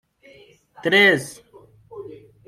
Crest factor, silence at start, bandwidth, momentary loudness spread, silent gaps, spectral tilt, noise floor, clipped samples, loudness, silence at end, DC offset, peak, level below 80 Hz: 20 dB; 0.85 s; 15 kHz; 25 LU; none; -4 dB/octave; -51 dBFS; under 0.1%; -17 LUFS; 0.3 s; under 0.1%; -4 dBFS; -66 dBFS